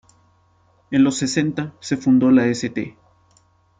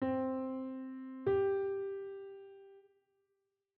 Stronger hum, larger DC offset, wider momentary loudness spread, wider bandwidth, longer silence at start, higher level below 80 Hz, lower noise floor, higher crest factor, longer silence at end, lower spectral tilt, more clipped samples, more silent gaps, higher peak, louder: neither; neither; second, 13 LU vs 19 LU; first, 9.4 kHz vs 4.1 kHz; first, 0.9 s vs 0 s; first, -58 dBFS vs -74 dBFS; second, -58 dBFS vs -84 dBFS; about the same, 16 dB vs 16 dB; about the same, 0.9 s vs 1 s; second, -5.5 dB/octave vs -7 dB/octave; neither; neither; first, -4 dBFS vs -22 dBFS; first, -19 LUFS vs -37 LUFS